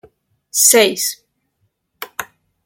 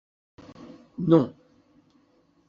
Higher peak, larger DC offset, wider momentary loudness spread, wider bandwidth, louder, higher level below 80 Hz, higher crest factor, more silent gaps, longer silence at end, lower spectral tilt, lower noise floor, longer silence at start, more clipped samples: first, 0 dBFS vs -6 dBFS; neither; second, 23 LU vs 26 LU; first, 17 kHz vs 6.8 kHz; first, -13 LUFS vs -23 LUFS; about the same, -68 dBFS vs -66 dBFS; about the same, 20 dB vs 22 dB; neither; second, 0.4 s vs 1.15 s; second, 0 dB/octave vs -9 dB/octave; first, -68 dBFS vs -64 dBFS; about the same, 0.55 s vs 0.6 s; neither